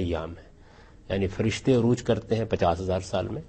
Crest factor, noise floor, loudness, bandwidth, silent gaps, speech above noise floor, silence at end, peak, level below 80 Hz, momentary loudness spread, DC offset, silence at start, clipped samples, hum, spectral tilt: 18 dB; -51 dBFS; -26 LUFS; 8.4 kHz; none; 25 dB; 0 s; -8 dBFS; -46 dBFS; 10 LU; under 0.1%; 0 s; under 0.1%; none; -6.5 dB/octave